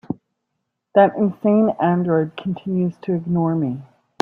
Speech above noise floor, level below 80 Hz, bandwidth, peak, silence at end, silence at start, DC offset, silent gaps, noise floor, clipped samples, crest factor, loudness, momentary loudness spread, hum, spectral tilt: 58 dB; -62 dBFS; 4 kHz; -2 dBFS; 0.4 s; 0.1 s; under 0.1%; none; -77 dBFS; under 0.1%; 18 dB; -19 LUFS; 11 LU; none; -9.5 dB/octave